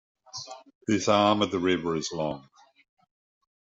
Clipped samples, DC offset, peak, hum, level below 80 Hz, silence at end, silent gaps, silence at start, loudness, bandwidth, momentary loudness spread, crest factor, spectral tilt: under 0.1%; under 0.1%; -8 dBFS; none; -64 dBFS; 1.35 s; 0.75-0.81 s; 0.35 s; -26 LUFS; 7.8 kHz; 19 LU; 20 dB; -4.5 dB/octave